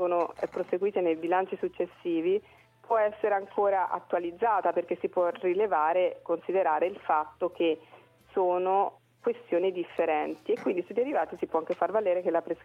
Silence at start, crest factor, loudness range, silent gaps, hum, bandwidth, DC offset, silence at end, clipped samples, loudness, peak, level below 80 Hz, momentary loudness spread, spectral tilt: 0 s; 16 dB; 2 LU; none; none; 6 kHz; under 0.1%; 0.1 s; under 0.1%; -29 LUFS; -12 dBFS; -72 dBFS; 7 LU; -7 dB/octave